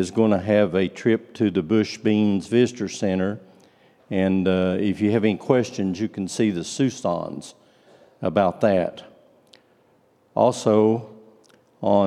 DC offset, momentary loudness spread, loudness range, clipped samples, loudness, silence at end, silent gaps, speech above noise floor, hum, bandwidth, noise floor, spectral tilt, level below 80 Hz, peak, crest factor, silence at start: under 0.1%; 9 LU; 4 LU; under 0.1%; -22 LUFS; 0 s; none; 39 dB; none; 11 kHz; -60 dBFS; -6.5 dB/octave; -66 dBFS; -2 dBFS; 20 dB; 0 s